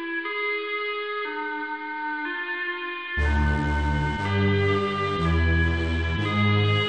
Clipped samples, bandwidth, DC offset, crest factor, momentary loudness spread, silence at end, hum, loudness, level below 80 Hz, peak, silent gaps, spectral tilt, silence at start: under 0.1%; 8.8 kHz; under 0.1%; 14 dB; 7 LU; 0 s; none; -25 LUFS; -32 dBFS; -12 dBFS; none; -7 dB/octave; 0 s